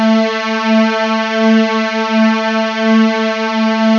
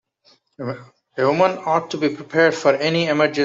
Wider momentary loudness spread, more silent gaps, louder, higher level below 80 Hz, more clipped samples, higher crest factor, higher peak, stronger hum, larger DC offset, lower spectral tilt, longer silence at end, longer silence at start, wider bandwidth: second, 4 LU vs 14 LU; neither; first, -13 LUFS vs -19 LUFS; about the same, -62 dBFS vs -66 dBFS; neither; second, 12 dB vs 18 dB; about the same, 0 dBFS vs -2 dBFS; neither; neither; about the same, -5.5 dB/octave vs -5.5 dB/octave; about the same, 0 s vs 0 s; second, 0 s vs 0.6 s; about the same, 7.2 kHz vs 7.8 kHz